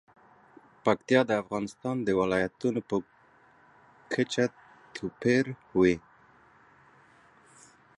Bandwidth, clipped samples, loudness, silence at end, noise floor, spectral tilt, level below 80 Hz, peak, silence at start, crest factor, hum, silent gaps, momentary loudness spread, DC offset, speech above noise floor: 11 kHz; under 0.1%; -29 LUFS; 2 s; -60 dBFS; -6 dB/octave; -62 dBFS; -8 dBFS; 0.85 s; 22 dB; none; none; 10 LU; under 0.1%; 33 dB